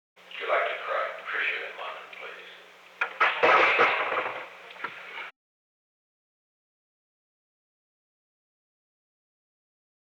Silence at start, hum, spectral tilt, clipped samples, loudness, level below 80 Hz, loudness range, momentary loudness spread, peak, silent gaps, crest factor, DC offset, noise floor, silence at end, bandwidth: 0.25 s; 60 Hz at -80 dBFS; -2.5 dB/octave; under 0.1%; -25 LUFS; -88 dBFS; 18 LU; 21 LU; -10 dBFS; none; 20 dB; under 0.1%; -51 dBFS; 4.8 s; 18.5 kHz